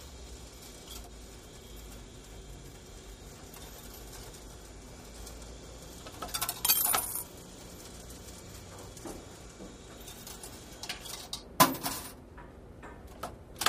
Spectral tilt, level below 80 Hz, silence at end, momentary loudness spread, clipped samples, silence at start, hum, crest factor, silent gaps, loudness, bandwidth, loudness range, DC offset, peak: -2 dB/octave; -52 dBFS; 0 s; 23 LU; under 0.1%; 0 s; none; 32 dB; none; -33 LUFS; 15.5 kHz; 15 LU; under 0.1%; -6 dBFS